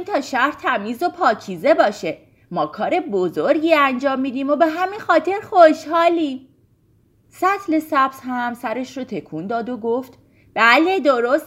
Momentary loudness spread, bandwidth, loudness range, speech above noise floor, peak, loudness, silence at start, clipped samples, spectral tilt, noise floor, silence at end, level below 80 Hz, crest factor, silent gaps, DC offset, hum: 14 LU; 16 kHz; 6 LU; 39 dB; 0 dBFS; -18 LUFS; 0 s; under 0.1%; -5 dB/octave; -58 dBFS; 0 s; -64 dBFS; 18 dB; none; under 0.1%; none